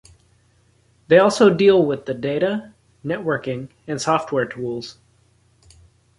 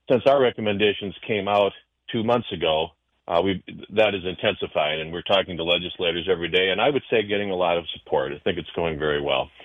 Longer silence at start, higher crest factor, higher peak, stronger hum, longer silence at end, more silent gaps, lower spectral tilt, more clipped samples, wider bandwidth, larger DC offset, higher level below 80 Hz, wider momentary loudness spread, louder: first, 1.1 s vs 0.1 s; about the same, 18 dB vs 18 dB; first, -2 dBFS vs -6 dBFS; neither; first, 1.3 s vs 0 s; neither; second, -5.5 dB/octave vs -7 dB/octave; neither; first, 11.5 kHz vs 6.8 kHz; neither; second, -58 dBFS vs -52 dBFS; first, 16 LU vs 7 LU; first, -19 LUFS vs -23 LUFS